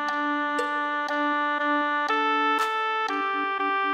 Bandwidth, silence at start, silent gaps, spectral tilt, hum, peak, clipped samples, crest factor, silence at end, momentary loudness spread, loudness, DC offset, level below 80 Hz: 16 kHz; 0 s; none; -1.5 dB/octave; none; -12 dBFS; under 0.1%; 12 dB; 0 s; 4 LU; -25 LUFS; under 0.1%; -78 dBFS